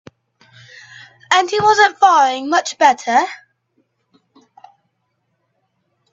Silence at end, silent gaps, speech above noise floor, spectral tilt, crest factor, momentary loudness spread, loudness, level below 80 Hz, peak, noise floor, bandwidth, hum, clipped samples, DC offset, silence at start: 2.8 s; none; 55 dB; -2 dB/octave; 18 dB; 11 LU; -14 LUFS; -66 dBFS; 0 dBFS; -69 dBFS; 7.8 kHz; none; under 0.1%; under 0.1%; 1.3 s